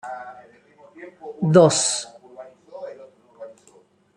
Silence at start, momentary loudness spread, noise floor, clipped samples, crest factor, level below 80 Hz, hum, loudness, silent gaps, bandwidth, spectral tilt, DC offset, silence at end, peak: 0.05 s; 28 LU; -56 dBFS; under 0.1%; 22 dB; -68 dBFS; none; -18 LUFS; none; 11.5 kHz; -4.5 dB/octave; under 0.1%; 0.7 s; -2 dBFS